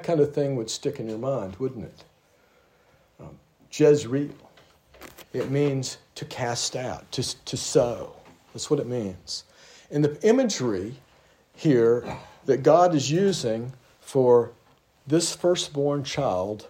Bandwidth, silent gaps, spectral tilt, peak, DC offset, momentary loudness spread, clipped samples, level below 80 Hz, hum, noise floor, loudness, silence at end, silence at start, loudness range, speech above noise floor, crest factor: 16 kHz; none; -5 dB/octave; -4 dBFS; under 0.1%; 15 LU; under 0.1%; -62 dBFS; none; -61 dBFS; -25 LUFS; 0 s; 0 s; 7 LU; 37 dB; 20 dB